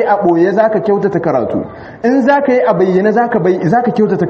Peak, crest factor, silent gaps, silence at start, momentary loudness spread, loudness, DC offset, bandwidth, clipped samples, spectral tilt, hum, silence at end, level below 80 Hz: 0 dBFS; 12 dB; none; 0 s; 6 LU; -12 LUFS; under 0.1%; 7 kHz; under 0.1%; -8.5 dB/octave; none; 0 s; -50 dBFS